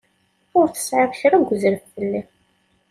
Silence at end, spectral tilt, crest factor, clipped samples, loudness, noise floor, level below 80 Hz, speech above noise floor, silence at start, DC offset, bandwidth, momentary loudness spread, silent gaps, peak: 0.7 s; -5 dB/octave; 18 dB; under 0.1%; -20 LUFS; -64 dBFS; -62 dBFS; 46 dB; 0.55 s; under 0.1%; 15 kHz; 9 LU; none; -4 dBFS